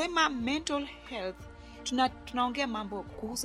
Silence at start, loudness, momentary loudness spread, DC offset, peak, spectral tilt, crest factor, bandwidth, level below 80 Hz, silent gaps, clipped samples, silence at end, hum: 0 s; -32 LUFS; 12 LU; under 0.1%; -10 dBFS; -3 dB/octave; 22 dB; 14.5 kHz; -54 dBFS; none; under 0.1%; 0 s; none